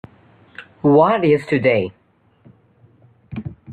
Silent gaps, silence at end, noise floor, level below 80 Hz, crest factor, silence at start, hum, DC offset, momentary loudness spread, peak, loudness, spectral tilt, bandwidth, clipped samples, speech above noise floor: none; 0 s; -53 dBFS; -56 dBFS; 18 dB; 0.6 s; none; under 0.1%; 21 LU; -2 dBFS; -16 LUFS; -8.5 dB/octave; 9.2 kHz; under 0.1%; 38 dB